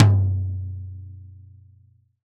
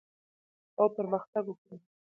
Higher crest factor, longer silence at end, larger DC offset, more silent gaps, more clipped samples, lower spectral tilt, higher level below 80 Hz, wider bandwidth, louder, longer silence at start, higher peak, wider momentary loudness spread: about the same, 22 dB vs 22 dB; first, 0.95 s vs 0.4 s; neither; second, none vs 1.28-1.33 s, 1.58-1.65 s; neither; second, -8.5 dB/octave vs -11.5 dB/octave; first, -54 dBFS vs -84 dBFS; first, 4.1 kHz vs 2.9 kHz; first, -24 LUFS vs -32 LUFS; second, 0 s vs 0.8 s; first, 0 dBFS vs -14 dBFS; first, 24 LU vs 17 LU